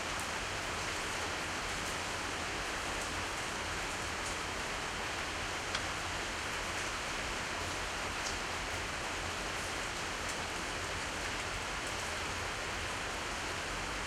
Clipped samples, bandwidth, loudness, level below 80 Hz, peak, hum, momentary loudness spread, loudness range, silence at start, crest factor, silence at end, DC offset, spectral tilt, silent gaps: under 0.1%; 16 kHz; -37 LUFS; -52 dBFS; -20 dBFS; none; 1 LU; 1 LU; 0 s; 18 dB; 0 s; under 0.1%; -2 dB/octave; none